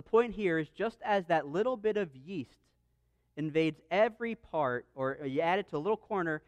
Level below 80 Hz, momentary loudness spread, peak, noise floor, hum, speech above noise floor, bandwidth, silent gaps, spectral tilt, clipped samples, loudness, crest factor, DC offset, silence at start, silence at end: -66 dBFS; 10 LU; -16 dBFS; -74 dBFS; none; 42 dB; 9.2 kHz; none; -7 dB/octave; under 0.1%; -33 LUFS; 16 dB; under 0.1%; 0.15 s; 0.1 s